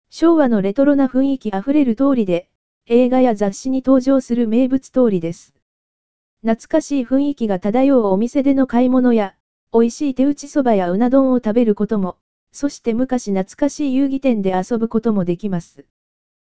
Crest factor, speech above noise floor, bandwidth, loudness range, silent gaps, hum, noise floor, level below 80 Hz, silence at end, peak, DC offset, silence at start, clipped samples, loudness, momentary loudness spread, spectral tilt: 16 dB; over 74 dB; 8 kHz; 3 LU; 2.55-2.81 s, 5.62-6.37 s, 9.40-9.67 s, 12.21-12.47 s; none; under -90 dBFS; -50 dBFS; 0.7 s; -2 dBFS; 2%; 0.05 s; under 0.1%; -17 LUFS; 8 LU; -7 dB/octave